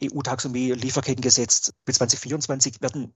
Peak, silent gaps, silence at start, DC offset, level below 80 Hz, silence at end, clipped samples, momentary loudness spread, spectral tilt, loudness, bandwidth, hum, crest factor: -2 dBFS; none; 0 s; under 0.1%; -62 dBFS; 0.05 s; under 0.1%; 9 LU; -3 dB/octave; -22 LUFS; 8.6 kHz; none; 22 dB